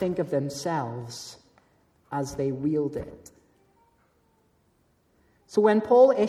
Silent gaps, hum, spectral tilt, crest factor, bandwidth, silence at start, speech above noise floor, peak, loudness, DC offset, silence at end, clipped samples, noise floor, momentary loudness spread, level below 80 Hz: none; none; -6.5 dB/octave; 20 dB; 13.5 kHz; 0 s; 42 dB; -8 dBFS; -26 LUFS; under 0.1%; 0 s; under 0.1%; -67 dBFS; 19 LU; -60 dBFS